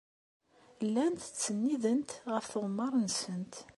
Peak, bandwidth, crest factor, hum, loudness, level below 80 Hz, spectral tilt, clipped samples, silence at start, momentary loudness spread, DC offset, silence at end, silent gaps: -18 dBFS; 11.5 kHz; 16 dB; none; -34 LUFS; -76 dBFS; -4.5 dB/octave; under 0.1%; 0.8 s; 6 LU; under 0.1%; 0.05 s; none